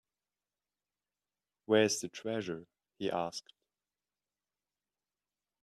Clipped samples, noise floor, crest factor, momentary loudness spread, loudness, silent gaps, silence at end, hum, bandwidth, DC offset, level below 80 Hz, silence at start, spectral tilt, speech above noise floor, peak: under 0.1%; under -90 dBFS; 24 dB; 15 LU; -34 LUFS; none; 2.2 s; 50 Hz at -70 dBFS; 13 kHz; under 0.1%; -80 dBFS; 1.7 s; -3.5 dB/octave; over 57 dB; -14 dBFS